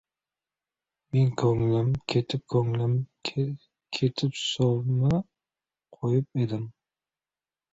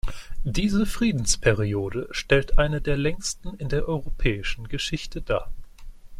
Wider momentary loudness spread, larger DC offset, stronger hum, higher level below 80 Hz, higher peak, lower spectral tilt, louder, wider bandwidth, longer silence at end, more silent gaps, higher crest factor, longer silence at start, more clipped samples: about the same, 9 LU vs 9 LU; neither; neither; second, -56 dBFS vs -30 dBFS; second, -10 dBFS vs -6 dBFS; first, -7 dB/octave vs -4.5 dB/octave; about the same, -27 LUFS vs -26 LUFS; second, 8 kHz vs 13 kHz; first, 1.05 s vs 0 s; neither; about the same, 18 dB vs 18 dB; first, 1.15 s vs 0.05 s; neither